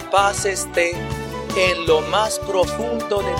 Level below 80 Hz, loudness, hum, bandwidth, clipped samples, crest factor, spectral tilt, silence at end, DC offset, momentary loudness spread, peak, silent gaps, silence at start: -38 dBFS; -20 LUFS; none; 17 kHz; under 0.1%; 18 dB; -3.5 dB/octave; 0 s; under 0.1%; 7 LU; -2 dBFS; none; 0 s